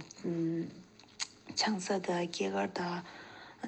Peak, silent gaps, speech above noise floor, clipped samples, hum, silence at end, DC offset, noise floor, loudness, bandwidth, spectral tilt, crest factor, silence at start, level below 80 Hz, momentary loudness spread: -18 dBFS; none; 21 dB; under 0.1%; none; 0 s; under 0.1%; -55 dBFS; -36 LUFS; 9 kHz; -4 dB/octave; 18 dB; 0 s; -78 dBFS; 16 LU